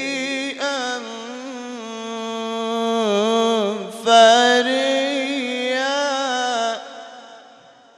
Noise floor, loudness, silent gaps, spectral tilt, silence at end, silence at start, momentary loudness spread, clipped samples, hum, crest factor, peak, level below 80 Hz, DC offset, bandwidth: -48 dBFS; -19 LUFS; none; -2.5 dB/octave; 0.55 s; 0 s; 18 LU; under 0.1%; none; 20 dB; 0 dBFS; -76 dBFS; under 0.1%; 12.5 kHz